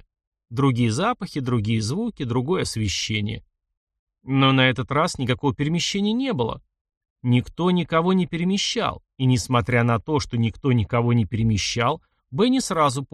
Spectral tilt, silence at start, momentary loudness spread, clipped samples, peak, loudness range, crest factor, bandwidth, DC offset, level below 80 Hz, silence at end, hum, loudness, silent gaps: -5.5 dB/octave; 0.5 s; 6 LU; under 0.1%; -4 dBFS; 2 LU; 18 dB; 12.5 kHz; under 0.1%; -48 dBFS; 0.1 s; none; -22 LUFS; 3.77-3.87 s, 3.99-4.07 s, 6.81-6.85 s, 6.97-7.01 s, 7.10-7.16 s